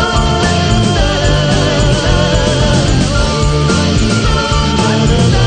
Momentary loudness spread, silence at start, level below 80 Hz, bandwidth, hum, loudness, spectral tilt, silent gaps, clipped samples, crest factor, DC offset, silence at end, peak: 1 LU; 0 s; -18 dBFS; 9.6 kHz; none; -12 LUFS; -5 dB/octave; none; under 0.1%; 10 dB; under 0.1%; 0 s; 0 dBFS